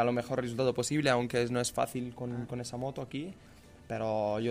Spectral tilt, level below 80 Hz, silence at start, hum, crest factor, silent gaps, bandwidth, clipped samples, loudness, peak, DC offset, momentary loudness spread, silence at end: -5 dB/octave; -60 dBFS; 0 s; none; 18 dB; none; 15.5 kHz; under 0.1%; -33 LUFS; -14 dBFS; under 0.1%; 11 LU; 0 s